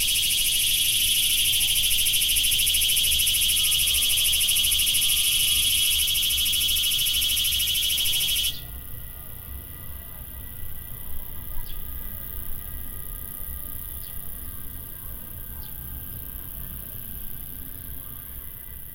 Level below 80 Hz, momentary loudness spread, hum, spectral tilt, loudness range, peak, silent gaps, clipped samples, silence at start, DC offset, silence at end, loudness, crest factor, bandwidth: -38 dBFS; 18 LU; none; 1 dB/octave; 16 LU; -8 dBFS; none; under 0.1%; 0 s; under 0.1%; 0 s; -19 LUFS; 18 dB; 17 kHz